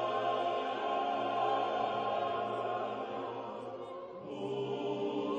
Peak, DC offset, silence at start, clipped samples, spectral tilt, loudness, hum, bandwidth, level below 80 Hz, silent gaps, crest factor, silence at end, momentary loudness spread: -20 dBFS; under 0.1%; 0 s; under 0.1%; -6 dB/octave; -36 LUFS; none; 8.6 kHz; -78 dBFS; none; 14 dB; 0 s; 11 LU